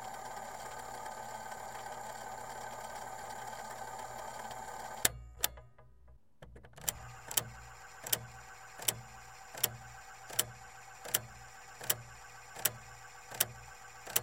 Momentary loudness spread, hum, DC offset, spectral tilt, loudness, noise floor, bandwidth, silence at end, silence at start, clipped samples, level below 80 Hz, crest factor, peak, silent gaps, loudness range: 16 LU; none; under 0.1%; -1 dB/octave; -38 LUFS; -62 dBFS; 16.5 kHz; 0 s; 0 s; under 0.1%; -62 dBFS; 34 dB; -8 dBFS; none; 7 LU